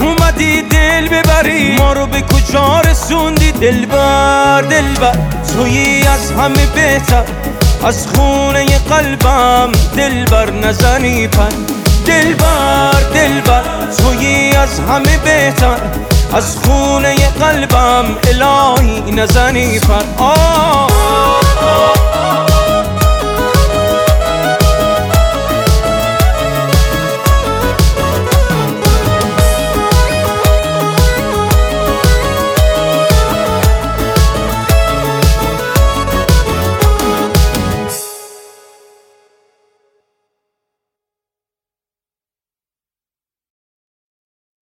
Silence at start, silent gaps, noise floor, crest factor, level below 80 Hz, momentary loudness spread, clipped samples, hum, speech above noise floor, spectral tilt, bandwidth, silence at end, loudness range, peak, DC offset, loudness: 0 s; none; under -90 dBFS; 10 dB; -16 dBFS; 4 LU; under 0.1%; none; over 80 dB; -4.5 dB/octave; 18.5 kHz; 6.3 s; 2 LU; 0 dBFS; under 0.1%; -11 LUFS